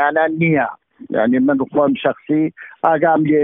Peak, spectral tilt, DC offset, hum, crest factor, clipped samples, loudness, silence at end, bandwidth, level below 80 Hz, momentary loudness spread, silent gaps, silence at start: 0 dBFS; -6 dB/octave; under 0.1%; none; 16 dB; under 0.1%; -17 LUFS; 0 s; 3.8 kHz; -58 dBFS; 6 LU; none; 0 s